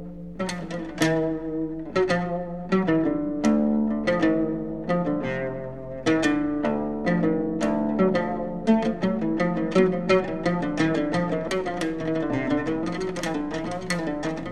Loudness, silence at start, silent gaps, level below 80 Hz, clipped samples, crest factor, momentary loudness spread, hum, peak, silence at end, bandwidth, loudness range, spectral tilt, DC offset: -25 LUFS; 0 s; none; -50 dBFS; under 0.1%; 16 dB; 8 LU; none; -8 dBFS; 0 s; 12.5 kHz; 2 LU; -6.5 dB/octave; 0.6%